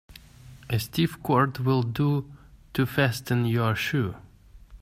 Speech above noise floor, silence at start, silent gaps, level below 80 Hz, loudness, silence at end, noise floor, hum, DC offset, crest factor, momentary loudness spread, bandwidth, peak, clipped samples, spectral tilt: 24 dB; 0.15 s; none; -52 dBFS; -26 LUFS; 0.05 s; -49 dBFS; none; under 0.1%; 18 dB; 8 LU; 16 kHz; -8 dBFS; under 0.1%; -6.5 dB/octave